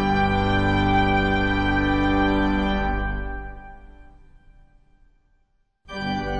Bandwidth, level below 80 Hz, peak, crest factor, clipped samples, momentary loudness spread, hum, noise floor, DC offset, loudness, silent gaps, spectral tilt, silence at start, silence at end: 8.4 kHz; -32 dBFS; -8 dBFS; 14 dB; under 0.1%; 15 LU; none; -65 dBFS; under 0.1%; -22 LUFS; none; -7 dB/octave; 0 s; 0 s